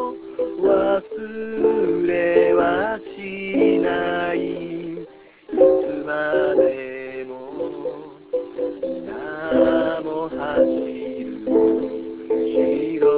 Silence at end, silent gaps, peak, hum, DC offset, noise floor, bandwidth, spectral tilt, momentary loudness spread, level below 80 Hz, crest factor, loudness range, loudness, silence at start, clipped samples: 0 s; none; -2 dBFS; none; under 0.1%; -41 dBFS; 4 kHz; -10 dB/octave; 13 LU; -54 dBFS; 18 dB; 4 LU; -21 LUFS; 0 s; under 0.1%